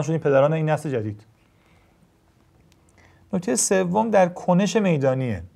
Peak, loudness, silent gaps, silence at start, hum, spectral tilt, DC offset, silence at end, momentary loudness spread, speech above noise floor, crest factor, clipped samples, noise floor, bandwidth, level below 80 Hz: -6 dBFS; -21 LUFS; none; 0 s; none; -5.5 dB/octave; under 0.1%; 0.1 s; 10 LU; 38 dB; 16 dB; under 0.1%; -59 dBFS; 14.5 kHz; -62 dBFS